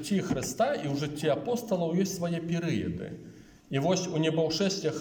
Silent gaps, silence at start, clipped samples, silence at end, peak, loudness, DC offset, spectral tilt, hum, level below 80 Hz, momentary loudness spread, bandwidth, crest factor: none; 0 s; under 0.1%; 0 s; -14 dBFS; -30 LUFS; under 0.1%; -5.5 dB/octave; none; -60 dBFS; 6 LU; 17.5 kHz; 16 dB